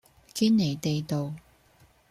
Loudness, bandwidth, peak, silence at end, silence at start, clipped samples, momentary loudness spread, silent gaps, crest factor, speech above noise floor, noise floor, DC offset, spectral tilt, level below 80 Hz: -27 LUFS; 14 kHz; -14 dBFS; 0.7 s; 0.35 s; under 0.1%; 15 LU; none; 16 dB; 35 dB; -61 dBFS; under 0.1%; -6 dB/octave; -62 dBFS